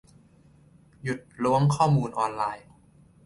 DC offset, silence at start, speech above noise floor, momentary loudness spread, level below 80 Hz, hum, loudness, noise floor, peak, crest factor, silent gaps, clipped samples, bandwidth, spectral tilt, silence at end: under 0.1%; 1.05 s; 32 dB; 13 LU; -58 dBFS; none; -26 LUFS; -57 dBFS; -8 dBFS; 18 dB; none; under 0.1%; 11.5 kHz; -7 dB/octave; 0.65 s